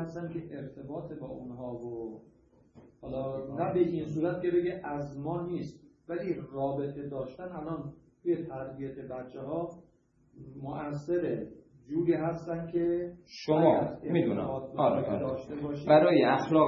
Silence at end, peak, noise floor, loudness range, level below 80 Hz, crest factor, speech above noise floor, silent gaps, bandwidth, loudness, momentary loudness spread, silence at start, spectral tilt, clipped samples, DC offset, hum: 0 s; -8 dBFS; -66 dBFS; 9 LU; -62 dBFS; 22 dB; 35 dB; none; 7.2 kHz; -32 LUFS; 16 LU; 0 s; -8.5 dB/octave; under 0.1%; under 0.1%; none